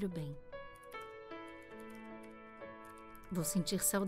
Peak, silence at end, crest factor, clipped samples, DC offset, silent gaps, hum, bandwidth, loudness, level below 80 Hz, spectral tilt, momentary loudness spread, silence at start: -20 dBFS; 0 s; 22 dB; under 0.1%; under 0.1%; none; none; 16 kHz; -42 LUFS; -64 dBFS; -4 dB/octave; 17 LU; 0 s